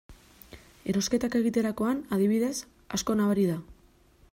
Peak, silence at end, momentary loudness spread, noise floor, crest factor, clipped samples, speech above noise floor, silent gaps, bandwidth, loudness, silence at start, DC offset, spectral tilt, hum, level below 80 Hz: -14 dBFS; 0.6 s; 9 LU; -60 dBFS; 16 dB; under 0.1%; 33 dB; none; 16 kHz; -28 LUFS; 0.1 s; under 0.1%; -5.5 dB/octave; none; -56 dBFS